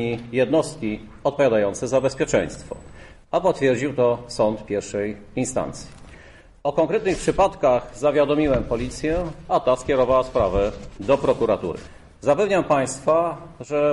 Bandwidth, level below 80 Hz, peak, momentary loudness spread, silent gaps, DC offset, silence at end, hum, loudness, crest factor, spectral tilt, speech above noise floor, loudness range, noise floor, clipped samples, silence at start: 11.5 kHz; -42 dBFS; -6 dBFS; 10 LU; none; under 0.1%; 0 s; none; -22 LUFS; 14 dB; -5.5 dB/octave; 25 dB; 3 LU; -47 dBFS; under 0.1%; 0 s